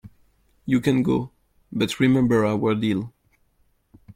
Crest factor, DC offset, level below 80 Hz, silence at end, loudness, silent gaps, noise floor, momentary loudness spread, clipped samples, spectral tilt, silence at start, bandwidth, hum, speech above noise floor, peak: 18 dB; under 0.1%; -54 dBFS; 1.05 s; -22 LUFS; none; -65 dBFS; 17 LU; under 0.1%; -7 dB/octave; 0.05 s; 15.5 kHz; none; 44 dB; -6 dBFS